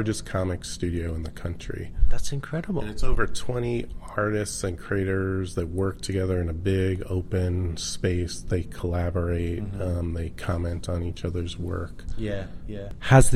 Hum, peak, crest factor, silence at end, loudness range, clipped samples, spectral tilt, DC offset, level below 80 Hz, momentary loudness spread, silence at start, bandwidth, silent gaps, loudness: none; -4 dBFS; 20 dB; 0 s; 3 LU; under 0.1%; -6 dB/octave; 0.8%; -34 dBFS; 7 LU; 0 s; 14 kHz; none; -28 LUFS